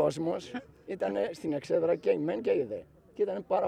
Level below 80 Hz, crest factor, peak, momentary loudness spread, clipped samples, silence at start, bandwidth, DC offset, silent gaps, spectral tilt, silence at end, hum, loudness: -68 dBFS; 16 dB; -14 dBFS; 14 LU; under 0.1%; 0 s; 10.5 kHz; under 0.1%; none; -6.5 dB/octave; 0 s; none; -31 LUFS